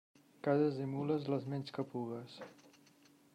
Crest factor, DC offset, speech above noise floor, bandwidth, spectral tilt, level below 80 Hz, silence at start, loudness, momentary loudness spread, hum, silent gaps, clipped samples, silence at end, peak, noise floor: 18 dB; under 0.1%; 29 dB; 11.5 kHz; -8 dB/octave; -84 dBFS; 0.45 s; -38 LUFS; 17 LU; none; none; under 0.1%; 0.8 s; -20 dBFS; -66 dBFS